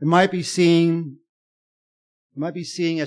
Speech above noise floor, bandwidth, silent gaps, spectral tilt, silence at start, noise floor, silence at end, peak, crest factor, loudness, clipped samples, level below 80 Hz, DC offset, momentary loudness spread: over 70 dB; 10.5 kHz; 1.29-2.30 s; -5.5 dB/octave; 0 s; under -90 dBFS; 0 s; -4 dBFS; 18 dB; -20 LUFS; under 0.1%; -68 dBFS; under 0.1%; 15 LU